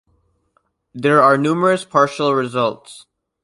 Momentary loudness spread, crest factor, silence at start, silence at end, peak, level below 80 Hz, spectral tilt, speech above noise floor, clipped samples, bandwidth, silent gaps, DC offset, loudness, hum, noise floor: 9 LU; 18 dB; 0.95 s; 0.45 s; -2 dBFS; -64 dBFS; -6 dB/octave; 49 dB; under 0.1%; 11.5 kHz; none; under 0.1%; -16 LUFS; none; -65 dBFS